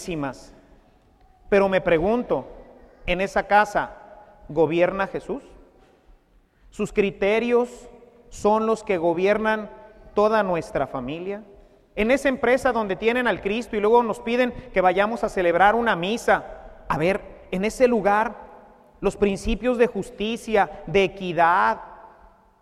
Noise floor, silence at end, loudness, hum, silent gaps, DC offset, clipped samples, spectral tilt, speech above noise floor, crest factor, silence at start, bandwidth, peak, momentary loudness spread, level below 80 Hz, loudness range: -58 dBFS; 0.55 s; -22 LUFS; none; none; under 0.1%; under 0.1%; -5.5 dB/octave; 37 dB; 20 dB; 0 s; 13.5 kHz; -2 dBFS; 12 LU; -44 dBFS; 4 LU